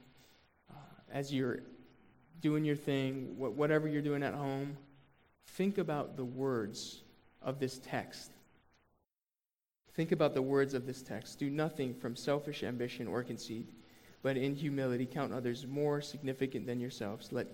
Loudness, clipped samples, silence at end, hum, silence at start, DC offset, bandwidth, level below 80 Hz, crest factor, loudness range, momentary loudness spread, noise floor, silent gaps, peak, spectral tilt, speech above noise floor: -37 LUFS; under 0.1%; 0 s; none; 0.7 s; under 0.1%; 17 kHz; -72 dBFS; 20 dB; 4 LU; 13 LU; under -90 dBFS; none; -18 dBFS; -6.5 dB/octave; over 54 dB